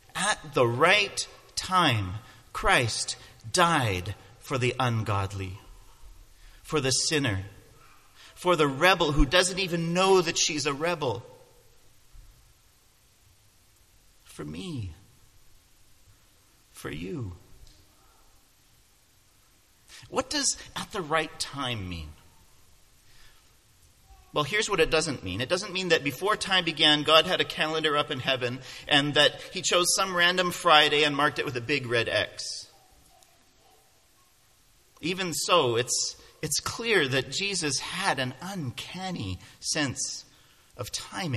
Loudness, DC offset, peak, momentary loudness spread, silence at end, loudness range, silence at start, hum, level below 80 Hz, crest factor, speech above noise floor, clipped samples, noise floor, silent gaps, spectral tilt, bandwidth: -25 LUFS; under 0.1%; -2 dBFS; 16 LU; 0 s; 20 LU; 0.15 s; none; -48 dBFS; 26 dB; 36 dB; under 0.1%; -63 dBFS; none; -3 dB/octave; 14.5 kHz